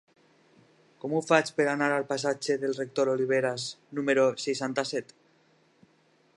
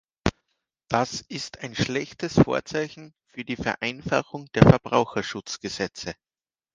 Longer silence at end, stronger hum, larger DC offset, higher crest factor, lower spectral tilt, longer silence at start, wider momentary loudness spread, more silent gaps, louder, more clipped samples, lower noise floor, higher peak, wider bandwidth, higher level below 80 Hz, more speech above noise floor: first, 1.35 s vs 0.65 s; neither; neither; about the same, 24 dB vs 26 dB; second, -4.5 dB/octave vs -6 dB/octave; first, 1.05 s vs 0.25 s; second, 9 LU vs 16 LU; neither; second, -28 LUFS vs -25 LUFS; neither; second, -65 dBFS vs under -90 dBFS; second, -6 dBFS vs 0 dBFS; first, 11.5 kHz vs 9.6 kHz; second, -82 dBFS vs -46 dBFS; second, 38 dB vs over 66 dB